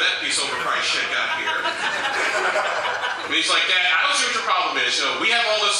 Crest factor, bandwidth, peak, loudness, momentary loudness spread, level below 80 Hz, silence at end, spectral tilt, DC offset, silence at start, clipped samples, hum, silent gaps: 14 dB; 15 kHz; -6 dBFS; -19 LUFS; 6 LU; -70 dBFS; 0 s; 0.5 dB/octave; under 0.1%; 0 s; under 0.1%; none; none